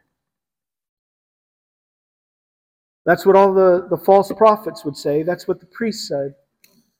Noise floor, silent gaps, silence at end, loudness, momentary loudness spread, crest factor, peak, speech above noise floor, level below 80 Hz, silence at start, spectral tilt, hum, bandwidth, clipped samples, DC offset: -90 dBFS; none; 0.7 s; -17 LUFS; 13 LU; 18 dB; 0 dBFS; 74 dB; -64 dBFS; 3.05 s; -6 dB/octave; none; 16 kHz; under 0.1%; under 0.1%